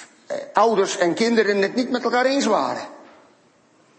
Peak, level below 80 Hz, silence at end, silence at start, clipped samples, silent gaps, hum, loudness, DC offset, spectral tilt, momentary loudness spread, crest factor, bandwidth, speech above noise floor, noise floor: -2 dBFS; -72 dBFS; 0.95 s; 0 s; under 0.1%; none; none; -20 LUFS; under 0.1%; -4 dB/octave; 13 LU; 20 dB; 8.8 kHz; 37 dB; -57 dBFS